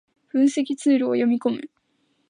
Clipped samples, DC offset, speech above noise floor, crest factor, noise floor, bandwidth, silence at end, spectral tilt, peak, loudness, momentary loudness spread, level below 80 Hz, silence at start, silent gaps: under 0.1%; under 0.1%; 48 dB; 14 dB; -68 dBFS; 10 kHz; 0.65 s; -5 dB/octave; -8 dBFS; -22 LUFS; 8 LU; -78 dBFS; 0.35 s; none